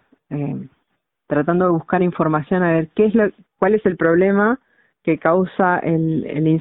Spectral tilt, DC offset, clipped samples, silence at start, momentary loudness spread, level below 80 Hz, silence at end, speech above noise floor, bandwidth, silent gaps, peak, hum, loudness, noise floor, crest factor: -13 dB/octave; under 0.1%; under 0.1%; 0.3 s; 10 LU; -54 dBFS; 0 s; 55 dB; 4 kHz; none; -2 dBFS; none; -18 LUFS; -72 dBFS; 16 dB